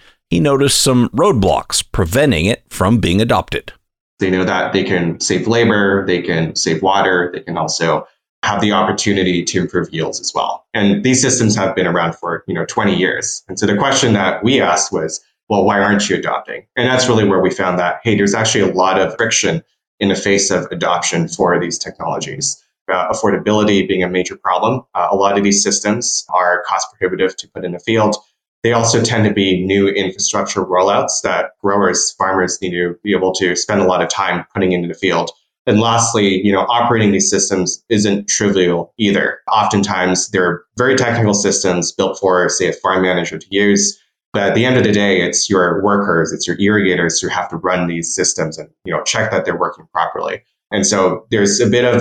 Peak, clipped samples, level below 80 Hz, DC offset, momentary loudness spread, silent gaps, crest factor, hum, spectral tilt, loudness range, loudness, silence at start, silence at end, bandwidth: -2 dBFS; under 0.1%; -44 dBFS; under 0.1%; 7 LU; 4.01-4.17 s, 8.29-8.42 s, 15.43-15.47 s, 19.87-19.98 s, 22.81-22.85 s, 28.48-28.62 s, 35.59-35.65 s, 44.26-44.32 s; 14 dB; none; -4 dB/octave; 3 LU; -15 LUFS; 0.3 s; 0 s; 16 kHz